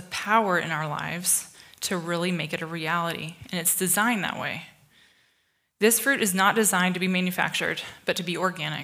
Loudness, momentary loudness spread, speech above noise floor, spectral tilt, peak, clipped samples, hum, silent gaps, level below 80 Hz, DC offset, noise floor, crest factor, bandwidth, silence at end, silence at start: -25 LUFS; 10 LU; 45 dB; -3 dB/octave; -6 dBFS; under 0.1%; none; none; -70 dBFS; under 0.1%; -71 dBFS; 20 dB; 16.5 kHz; 0 s; 0 s